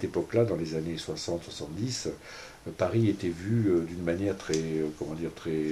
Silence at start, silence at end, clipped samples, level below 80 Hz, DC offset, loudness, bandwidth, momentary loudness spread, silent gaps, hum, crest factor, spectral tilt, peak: 0 s; 0 s; under 0.1%; -56 dBFS; under 0.1%; -30 LUFS; 14 kHz; 10 LU; none; none; 18 dB; -6 dB/octave; -12 dBFS